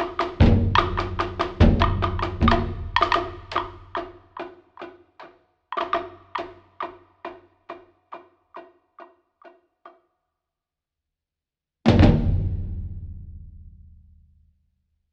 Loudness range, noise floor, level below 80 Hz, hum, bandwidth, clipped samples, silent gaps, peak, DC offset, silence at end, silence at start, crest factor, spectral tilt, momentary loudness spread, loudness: 17 LU; -88 dBFS; -32 dBFS; none; 7.4 kHz; under 0.1%; none; -2 dBFS; under 0.1%; 1.45 s; 0 s; 24 dB; -7.5 dB/octave; 25 LU; -23 LUFS